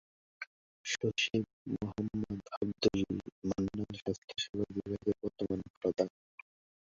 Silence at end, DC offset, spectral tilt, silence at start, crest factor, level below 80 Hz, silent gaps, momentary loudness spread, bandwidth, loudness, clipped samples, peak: 0.85 s; under 0.1%; -4.5 dB/octave; 0.4 s; 22 dB; -60 dBFS; 0.47-0.84 s, 1.53-1.65 s, 2.57-2.61 s, 3.32-3.42 s, 4.02-4.06 s, 4.18-4.28 s, 4.49-4.53 s, 5.70-5.81 s; 16 LU; 7.6 kHz; -36 LUFS; under 0.1%; -16 dBFS